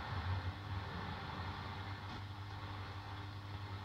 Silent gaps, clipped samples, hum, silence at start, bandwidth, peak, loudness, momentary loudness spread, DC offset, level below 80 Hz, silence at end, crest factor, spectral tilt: none; under 0.1%; none; 0 s; 8.8 kHz; -30 dBFS; -45 LUFS; 6 LU; under 0.1%; -58 dBFS; 0 s; 16 dB; -6 dB/octave